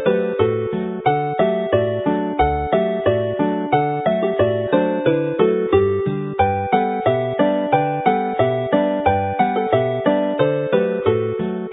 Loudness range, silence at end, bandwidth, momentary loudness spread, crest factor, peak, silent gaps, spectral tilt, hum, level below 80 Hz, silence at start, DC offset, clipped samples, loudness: 1 LU; 0 s; 4 kHz; 3 LU; 16 dB; -2 dBFS; none; -12 dB/octave; none; -40 dBFS; 0 s; under 0.1%; under 0.1%; -19 LUFS